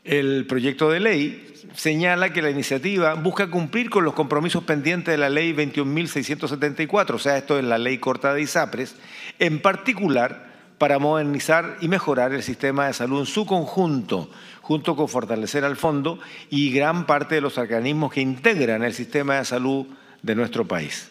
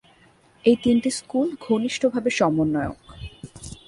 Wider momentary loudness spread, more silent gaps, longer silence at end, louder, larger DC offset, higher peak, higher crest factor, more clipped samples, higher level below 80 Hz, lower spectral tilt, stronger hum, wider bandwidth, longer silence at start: second, 7 LU vs 20 LU; neither; about the same, 0.05 s vs 0.15 s; about the same, -22 LUFS vs -22 LUFS; neither; first, 0 dBFS vs -6 dBFS; about the same, 22 dB vs 18 dB; neither; second, -68 dBFS vs -50 dBFS; about the same, -5 dB/octave vs -5 dB/octave; neither; first, 16 kHz vs 11.5 kHz; second, 0.05 s vs 0.65 s